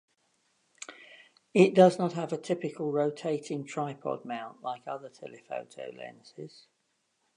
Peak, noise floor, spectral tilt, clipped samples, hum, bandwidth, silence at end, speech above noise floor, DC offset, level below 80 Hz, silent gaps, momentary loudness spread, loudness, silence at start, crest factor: -6 dBFS; -77 dBFS; -6.5 dB/octave; under 0.1%; none; 10.5 kHz; 0.9 s; 47 dB; under 0.1%; -82 dBFS; none; 24 LU; -29 LUFS; 0.9 s; 24 dB